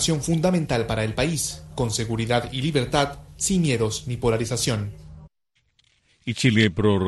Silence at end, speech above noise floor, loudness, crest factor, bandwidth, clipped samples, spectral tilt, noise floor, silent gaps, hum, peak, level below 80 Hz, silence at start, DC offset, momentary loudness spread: 0 s; 48 dB; -23 LUFS; 18 dB; 12.5 kHz; under 0.1%; -4.5 dB/octave; -70 dBFS; none; none; -6 dBFS; -44 dBFS; 0 s; under 0.1%; 9 LU